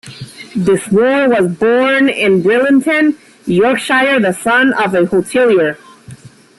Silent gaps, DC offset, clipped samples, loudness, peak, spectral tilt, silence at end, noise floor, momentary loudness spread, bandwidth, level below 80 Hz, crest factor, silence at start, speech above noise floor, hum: none; under 0.1%; under 0.1%; -12 LUFS; -2 dBFS; -5.5 dB/octave; 0.45 s; -36 dBFS; 7 LU; 12.5 kHz; -52 dBFS; 10 dB; 0.05 s; 25 dB; none